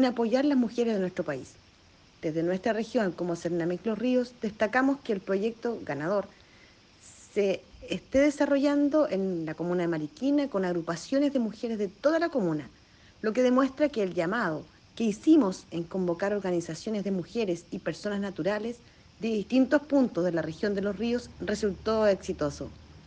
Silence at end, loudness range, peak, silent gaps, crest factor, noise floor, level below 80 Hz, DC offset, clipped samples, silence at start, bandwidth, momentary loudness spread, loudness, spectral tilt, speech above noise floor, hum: 0.05 s; 4 LU; -12 dBFS; none; 18 dB; -58 dBFS; -58 dBFS; under 0.1%; under 0.1%; 0 s; 9.4 kHz; 10 LU; -29 LUFS; -6 dB/octave; 30 dB; none